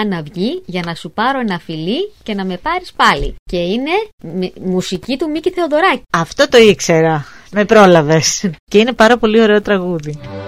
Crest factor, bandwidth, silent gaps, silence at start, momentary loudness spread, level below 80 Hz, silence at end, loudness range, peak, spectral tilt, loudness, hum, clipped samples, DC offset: 14 dB; 15.5 kHz; 3.39-3.46 s, 4.13-4.18 s, 8.59-8.67 s; 0 s; 13 LU; -38 dBFS; 0 s; 7 LU; 0 dBFS; -4.5 dB/octave; -14 LUFS; none; 0.2%; 0.7%